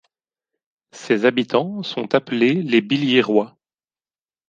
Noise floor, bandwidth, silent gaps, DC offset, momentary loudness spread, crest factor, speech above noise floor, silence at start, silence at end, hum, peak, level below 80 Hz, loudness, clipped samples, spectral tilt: under -90 dBFS; 8.8 kHz; none; under 0.1%; 10 LU; 18 dB; over 72 dB; 0.95 s; 1 s; none; -2 dBFS; -70 dBFS; -19 LUFS; under 0.1%; -6 dB/octave